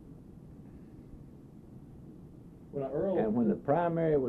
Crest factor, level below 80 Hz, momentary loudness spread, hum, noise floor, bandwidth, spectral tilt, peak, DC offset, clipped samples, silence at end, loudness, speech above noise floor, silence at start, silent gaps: 18 dB; -58 dBFS; 23 LU; none; -52 dBFS; 4.2 kHz; -10.5 dB/octave; -16 dBFS; under 0.1%; under 0.1%; 0 s; -31 LUFS; 22 dB; 0 s; none